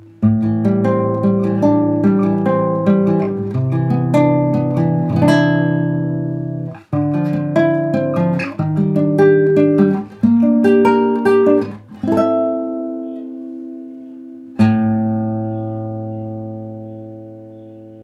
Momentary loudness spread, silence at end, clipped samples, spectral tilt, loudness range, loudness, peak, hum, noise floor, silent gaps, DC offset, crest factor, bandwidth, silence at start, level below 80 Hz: 17 LU; 0 s; under 0.1%; -9 dB/octave; 7 LU; -16 LUFS; 0 dBFS; none; -36 dBFS; none; under 0.1%; 16 dB; 11 kHz; 0.2 s; -52 dBFS